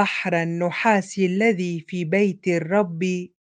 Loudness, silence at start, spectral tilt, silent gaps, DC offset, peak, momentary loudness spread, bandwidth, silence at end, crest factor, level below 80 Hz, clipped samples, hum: -22 LUFS; 0 s; -6 dB/octave; none; under 0.1%; -4 dBFS; 6 LU; 9.4 kHz; 0.15 s; 18 dB; -70 dBFS; under 0.1%; none